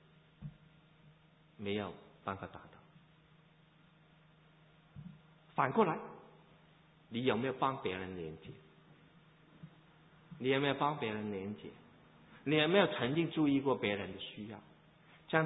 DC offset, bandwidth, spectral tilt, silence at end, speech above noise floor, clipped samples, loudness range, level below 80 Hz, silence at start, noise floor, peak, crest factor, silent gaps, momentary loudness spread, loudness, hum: under 0.1%; 3.9 kHz; -3 dB/octave; 0 s; 30 dB; under 0.1%; 12 LU; -70 dBFS; 0.4 s; -65 dBFS; -14 dBFS; 24 dB; none; 24 LU; -36 LUFS; none